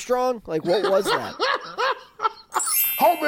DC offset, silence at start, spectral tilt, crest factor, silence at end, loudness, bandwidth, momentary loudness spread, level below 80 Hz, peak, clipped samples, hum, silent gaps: under 0.1%; 0 s; -2.5 dB/octave; 14 dB; 0 s; -22 LUFS; 17 kHz; 8 LU; -60 dBFS; -8 dBFS; under 0.1%; none; none